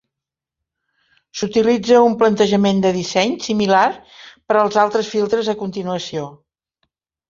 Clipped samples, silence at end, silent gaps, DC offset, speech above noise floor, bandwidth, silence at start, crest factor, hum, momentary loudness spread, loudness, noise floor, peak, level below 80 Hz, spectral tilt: under 0.1%; 0.95 s; none; under 0.1%; 69 dB; 7.6 kHz; 1.35 s; 18 dB; none; 13 LU; -17 LUFS; -85 dBFS; -2 dBFS; -56 dBFS; -5 dB/octave